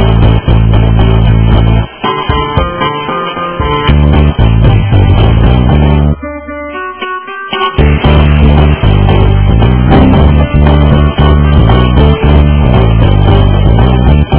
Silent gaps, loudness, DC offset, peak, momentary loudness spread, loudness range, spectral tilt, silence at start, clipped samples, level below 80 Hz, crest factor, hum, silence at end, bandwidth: none; -8 LUFS; under 0.1%; 0 dBFS; 8 LU; 3 LU; -11.5 dB/octave; 0 s; 4%; -10 dBFS; 6 dB; none; 0 s; 4 kHz